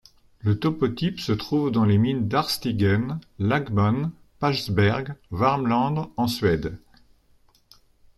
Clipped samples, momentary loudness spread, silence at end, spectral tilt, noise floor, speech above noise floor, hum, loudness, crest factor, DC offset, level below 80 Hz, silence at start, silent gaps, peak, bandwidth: under 0.1%; 7 LU; 1.4 s; -6.5 dB/octave; -59 dBFS; 37 dB; none; -24 LUFS; 18 dB; under 0.1%; -50 dBFS; 0.45 s; none; -6 dBFS; 13 kHz